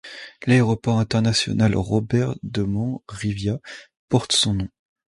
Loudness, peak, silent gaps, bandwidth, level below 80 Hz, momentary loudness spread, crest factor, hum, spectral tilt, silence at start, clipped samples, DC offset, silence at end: -22 LUFS; -4 dBFS; 3.97-4.08 s; 11.5 kHz; -44 dBFS; 12 LU; 18 dB; none; -5 dB/octave; 0.05 s; under 0.1%; under 0.1%; 0.45 s